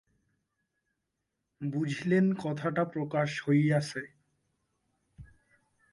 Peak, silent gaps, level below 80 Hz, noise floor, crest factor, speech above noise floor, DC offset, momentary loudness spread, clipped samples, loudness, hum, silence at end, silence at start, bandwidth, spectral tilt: -16 dBFS; none; -68 dBFS; -84 dBFS; 18 dB; 55 dB; under 0.1%; 12 LU; under 0.1%; -30 LUFS; none; 0.65 s; 1.6 s; 11.5 kHz; -7 dB/octave